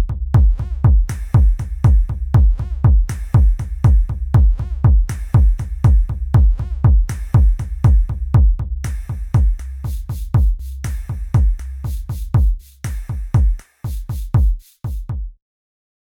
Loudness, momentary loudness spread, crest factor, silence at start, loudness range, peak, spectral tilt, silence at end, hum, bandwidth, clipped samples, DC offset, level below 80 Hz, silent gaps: -18 LUFS; 11 LU; 12 dB; 0 s; 5 LU; -2 dBFS; -8.5 dB/octave; 0.8 s; none; 10.5 kHz; under 0.1%; under 0.1%; -16 dBFS; none